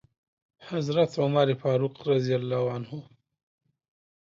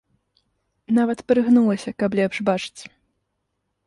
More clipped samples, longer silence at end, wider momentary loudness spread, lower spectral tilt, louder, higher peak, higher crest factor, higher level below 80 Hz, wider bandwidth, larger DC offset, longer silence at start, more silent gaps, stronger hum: neither; first, 1.35 s vs 1.05 s; first, 12 LU vs 9 LU; about the same, -7.5 dB/octave vs -6.5 dB/octave; second, -27 LUFS vs -20 LUFS; second, -10 dBFS vs -6 dBFS; about the same, 18 dB vs 18 dB; second, -70 dBFS vs -62 dBFS; second, 7.6 kHz vs 11.5 kHz; neither; second, 0.6 s vs 0.9 s; neither; neither